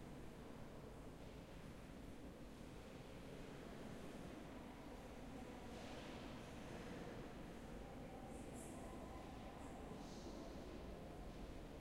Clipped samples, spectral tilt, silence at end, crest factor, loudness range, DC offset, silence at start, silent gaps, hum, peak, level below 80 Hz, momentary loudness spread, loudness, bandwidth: under 0.1%; -5.5 dB/octave; 0 s; 14 dB; 3 LU; under 0.1%; 0 s; none; none; -40 dBFS; -62 dBFS; 4 LU; -55 LUFS; 16 kHz